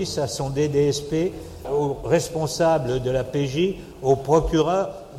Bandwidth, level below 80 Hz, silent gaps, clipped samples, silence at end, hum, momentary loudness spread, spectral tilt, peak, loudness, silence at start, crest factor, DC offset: 15.5 kHz; -40 dBFS; none; under 0.1%; 0 s; none; 6 LU; -5.5 dB/octave; -6 dBFS; -23 LUFS; 0 s; 16 dB; under 0.1%